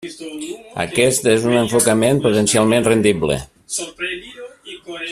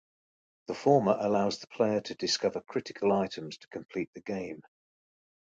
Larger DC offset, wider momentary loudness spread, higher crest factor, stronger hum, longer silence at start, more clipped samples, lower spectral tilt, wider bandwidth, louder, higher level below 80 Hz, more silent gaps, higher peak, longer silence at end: neither; about the same, 17 LU vs 16 LU; about the same, 18 dB vs 22 dB; neither; second, 0 s vs 0.7 s; neither; about the same, -4 dB/octave vs -5 dB/octave; first, 15 kHz vs 9 kHz; first, -16 LUFS vs -30 LUFS; first, -48 dBFS vs -70 dBFS; second, none vs 4.07-4.13 s; first, 0 dBFS vs -10 dBFS; second, 0 s vs 1 s